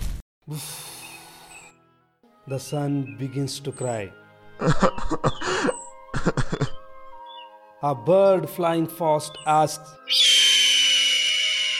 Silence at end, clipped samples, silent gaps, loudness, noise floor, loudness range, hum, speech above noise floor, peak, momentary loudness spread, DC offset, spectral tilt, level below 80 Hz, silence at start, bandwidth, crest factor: 0 s; under 0.1%; 0.22-0.41 s; -21 LUFS; -61 dBFS; 13 LU; none; 38 dB; -4 dBFS; 22 LU; under 0.1%; -3 dB/octave; -40 dBFS; 0 s; 16.5 kHz; 20 dB